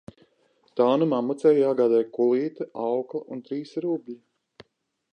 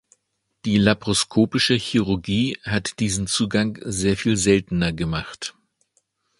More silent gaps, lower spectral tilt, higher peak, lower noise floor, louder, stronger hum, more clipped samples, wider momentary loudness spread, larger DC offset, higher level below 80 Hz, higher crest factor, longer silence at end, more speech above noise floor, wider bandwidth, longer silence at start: neither; first, -8 dB/octave vs -4.5 dB/octave; second, -8 dBFS vs 0 dBFS; about the same, -74 dBFS vs -74 dBFS; second, -24 LUFS vs -21 LUFS; neither; neither; first, 13 LU vs 8 LU; neither; second, -74 dBFS vs -44 dBFS; about the same, 18 dB vs 22 dB; about the same, 0.95 s vs 0.9 s; about the same, 51 dB vs 53 dB; second, 9.2 kHz vs 11.5 kHz; about the same, 0.75 s vs 0.65 s